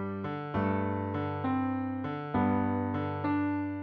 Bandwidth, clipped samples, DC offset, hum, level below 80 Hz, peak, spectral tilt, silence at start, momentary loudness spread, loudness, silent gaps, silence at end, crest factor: 5 kHz; under 0.1%; under 0.1%; none; -60 dBFS; -16 dBFS; -10.5 dB/octave; 0 s; 6 LU; -32 LUFS; none; 0 s; 16 dB